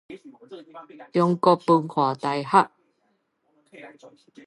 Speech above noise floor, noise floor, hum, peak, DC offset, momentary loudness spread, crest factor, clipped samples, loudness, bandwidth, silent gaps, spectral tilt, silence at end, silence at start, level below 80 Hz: 47 dB; -71 dBFS; none; -2 dBFS; under 0.1%; 25 LU; 22 dB; under 0.1%; -22 LUFS; 11.5 kHz; none; -7 dB/octave; 0.4 s; 0.1 s; -76 dBFS